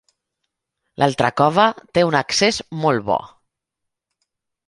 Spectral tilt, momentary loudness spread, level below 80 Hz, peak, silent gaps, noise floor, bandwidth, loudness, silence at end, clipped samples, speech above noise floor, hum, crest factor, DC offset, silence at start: -4.5 dB/octave; 6 LU; -54 dBFS; -2 dBFS; none; -81 dBFS; 11.5 kHz; -18 LUFS; 1.4 s; under 0.1%; 63 dB; none; 20 dB; under 0.1%; 1 s